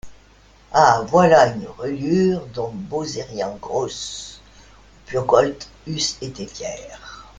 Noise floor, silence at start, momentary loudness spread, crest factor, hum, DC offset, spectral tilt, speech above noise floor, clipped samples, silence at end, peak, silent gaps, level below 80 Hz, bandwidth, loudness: -50 dBFS; 0.05 s; 17 LU; 20 dB; none; under 0.1%; -4.5 dB/octave; 31 dB; under 0.1%; 0.15 s; 0 dBFS; none; -50 dBFS; 9.4 kHz; -20 LUFS